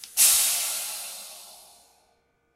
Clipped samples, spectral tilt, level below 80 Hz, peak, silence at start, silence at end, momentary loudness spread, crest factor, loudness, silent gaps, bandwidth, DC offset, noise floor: under 0.1%; 4 dB/octave; -68 dBFS; -2 dBFS; 0 s; 1 s; 23 LU; 24 dB; -21 LUFS; none; 16 kHz; under 0.1%; -68 dBFS